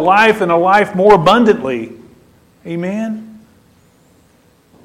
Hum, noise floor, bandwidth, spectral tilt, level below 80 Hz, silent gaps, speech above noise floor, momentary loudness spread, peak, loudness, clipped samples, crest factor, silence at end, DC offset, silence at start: none; -51 dBFS; 14.5 kHz; -6 dB/octave; -48 dBFS; none; 39 dB; 16 LU; 0 dBFS; -12 LUFS; under 0.1%; 14 dB; 1.45 s; under 0.1%; 0 s